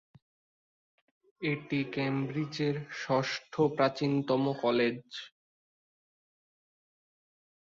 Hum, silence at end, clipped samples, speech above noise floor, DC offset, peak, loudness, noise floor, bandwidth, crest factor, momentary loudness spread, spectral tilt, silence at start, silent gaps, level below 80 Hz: none; 2.35 s; under 0.1%; over 59 dB; under 0.1%; -12 dBFS; -31 LUFS; under -90 dBFS; 7.6 kHz; 22 dB; 9 LU; -6.5 dB/octave; 1.4 s; none; -72 dBFS